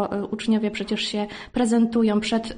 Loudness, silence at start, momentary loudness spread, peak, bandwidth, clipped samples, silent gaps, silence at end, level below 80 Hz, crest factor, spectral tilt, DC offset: -23 LUFS; 0 s; 7 LU; -8 dBFS; 10 kHz; under 0.1%; none; 0 s; -52 dBFS; 14 dB; -5 dB/octave; under 0.1%